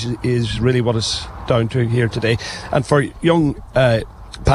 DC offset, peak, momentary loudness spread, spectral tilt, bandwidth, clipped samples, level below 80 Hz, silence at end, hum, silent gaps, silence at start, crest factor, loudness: under 0.1%; -2 dBFS; 6 LU; -6 dB/octave; 11.5 kHz; under 0.1%; -36 dBFS; 0 s; none; none; 0 s; 16 dB; -18 LUFS